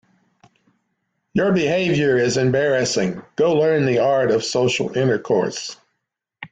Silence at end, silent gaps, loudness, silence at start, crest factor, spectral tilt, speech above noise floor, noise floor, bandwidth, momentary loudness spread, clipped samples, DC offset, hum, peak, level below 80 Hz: 0.05 s; none; -19 LUFS; 1.35 s; 12 dB; -5 dB/octave; 60 dB; -78 dBFS; 9.4 kHz; 8 LU; under 0.1%; under 0.1%; none; -6 dBFS; -56 dBFS